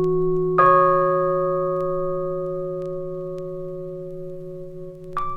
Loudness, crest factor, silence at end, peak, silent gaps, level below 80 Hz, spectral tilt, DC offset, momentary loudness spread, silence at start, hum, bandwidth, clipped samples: -22 LUFS; 18 dB; 0 s; -4 dBFS; none; -46 dBFS; -9.5 dB/octave; under 0.1%; 19 LU; 0 s; 50 Hz at -65 dBFS; 4.7 kHz; under 0.1%